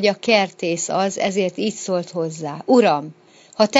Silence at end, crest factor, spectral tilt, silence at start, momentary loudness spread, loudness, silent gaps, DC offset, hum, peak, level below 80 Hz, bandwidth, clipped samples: 0 s; 20 dB; -4 dB/octave; 0 s; 11 LU; -20 LUFS; none; under 0.1%; none; 0 dBFS; -70 dBFS; 8 kHz; under 0.1%